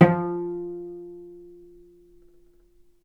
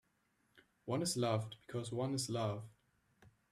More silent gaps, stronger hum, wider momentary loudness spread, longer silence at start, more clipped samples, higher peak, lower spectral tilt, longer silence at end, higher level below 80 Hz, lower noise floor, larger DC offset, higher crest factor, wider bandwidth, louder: neither; neither; first, 23 LU vs 12 LU; second, 0 s vs 0.55 s; neither; first, 0 dBFS vs -22 dBFS; first, -10 dB/octave vs -5 dB/octave; first, 1.55 s vs 0.25 s; first, -62 dBFS vs -76 dBFS; second, -57 dBFS vs -79 dBFS; neither; first, 26 dB vs 20 dB; second, 4.3 kHz vs 14.5 kHz; first, -27 LUFS vs -39 LUFS